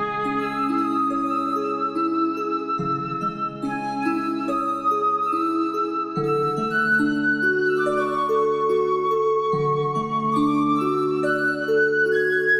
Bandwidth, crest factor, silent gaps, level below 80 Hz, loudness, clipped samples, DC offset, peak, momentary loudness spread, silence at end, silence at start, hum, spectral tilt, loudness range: 13 kHz; 12 dB; none; -58 dBFS; -22 LUFS; under 0.1%; under 0.1%; -10 dBFS; 5 LU; 0 s; 0 s; none; -6.5 dB/octave; 3 LU